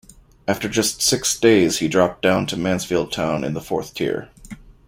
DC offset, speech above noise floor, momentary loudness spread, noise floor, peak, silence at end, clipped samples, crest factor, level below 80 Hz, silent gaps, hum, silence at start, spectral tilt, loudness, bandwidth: under 0.1%; 20 dB; 10 LU; -40 dBFS; -2 dBFS; 0.15 s; under 0.1%; 18 dB; -48 dBFS; none; none; 0.45 s; -3.5 dB/octave; -20 LUFS; 16.5 kHz